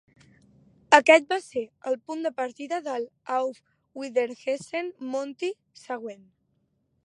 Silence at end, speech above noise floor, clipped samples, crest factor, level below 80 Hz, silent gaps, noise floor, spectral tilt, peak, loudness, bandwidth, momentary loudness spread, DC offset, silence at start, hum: 0.9 s; 46 dB; under 0.1%; 26 dB; -78 dBFS; none; -72 dBFS; -2.5 dB/octave; 0 dBFS; -26 LUFS; 11.5 kHz; 17 LU; under 0.1%; 0.9 s; none